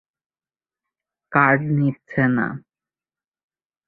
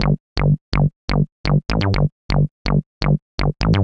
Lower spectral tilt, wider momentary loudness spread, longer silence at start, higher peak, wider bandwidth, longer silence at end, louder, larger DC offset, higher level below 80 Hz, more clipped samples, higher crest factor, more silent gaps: first, -11 dB/octave vs -7.5 dB/octave; first, 9 LU vs 3 LU; first, 1.3 s vs 0 s; about the same, -2 dBFS vs 0 dBFS; second, 4 kHz vs 7 kHz; first, 1.3 s vs 0 s; about the same, -20 LUFS vs -20 LUFS; neither; second, -60 dBFS vs -26 dBFS; neither; about the same, 22 dB vs 18 dB; second, none vs 0.20-0.36 s, 0.61-0.72 s, 0.96-1.08 s, 1.32-1.44 s, 2.12-2.29 s, 2.51-2.65 s, 2.86-3.01 s, 3.22-3.38 s